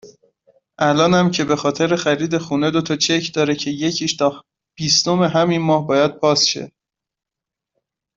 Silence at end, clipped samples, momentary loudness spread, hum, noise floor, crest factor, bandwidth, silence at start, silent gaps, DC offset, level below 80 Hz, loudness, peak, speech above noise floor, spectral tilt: 1.5 s; under 0.1%; 6 LU; none; -86 dBFS; 16 dB; 7.8 kHz; 0.05 s; none; under 0.1%; -58 dBFS; -17 LUFS; -2 dBFS; 69 dB; -4 dB/octave